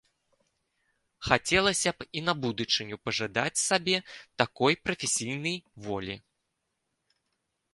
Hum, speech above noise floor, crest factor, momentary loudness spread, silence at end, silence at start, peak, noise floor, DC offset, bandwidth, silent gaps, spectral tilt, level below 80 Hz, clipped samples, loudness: none; 52 dB; 28 dB; 12 LU; 1.55 s; 1.2 s; -4 dBFS; -81 dBFS; under 0.1%; 11.5 kHz; none; -2.5 dB/octave; -58 dBFS; under 0.1%; -28 LUFS